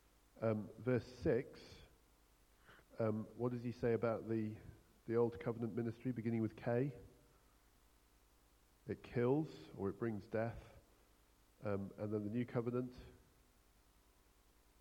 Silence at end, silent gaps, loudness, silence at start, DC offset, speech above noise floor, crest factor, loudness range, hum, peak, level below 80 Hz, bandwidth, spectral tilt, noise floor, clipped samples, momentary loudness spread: 1.65 s; none; -42 LUFS; 0.35 s; under 0.1%; 30 dB; 20 dB; 5 LU; none; -24 dBFS; -68 dBFS; 16.5 kHz; -8.5 dB/octave; -71 dBFS; under 0.1%; 16 LU